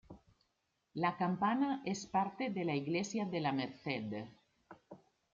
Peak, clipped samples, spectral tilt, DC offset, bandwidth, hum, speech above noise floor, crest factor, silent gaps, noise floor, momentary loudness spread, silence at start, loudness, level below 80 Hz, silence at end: -20 dBFS; under 0.1%; -5 dB/octave; under 0.1%; 7.6 kHz; none; 46 dB; 18 dB; none; -83 dBFS; 13 LU; 0.1 s; -37 LUFS; -76 dBFS; 0.4 s